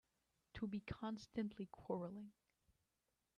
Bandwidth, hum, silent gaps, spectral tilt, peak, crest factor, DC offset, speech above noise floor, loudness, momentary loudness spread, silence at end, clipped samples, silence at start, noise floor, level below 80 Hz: 9.8 kHz; none; none; -7 dB/octave; -32 dBFS; 20 dB; under 0.1%; 41 dB; -49 LUFS; 10 LU; 1.05 s; under 0.1%; 0.55 s; -89 dBFS; -72 dBFS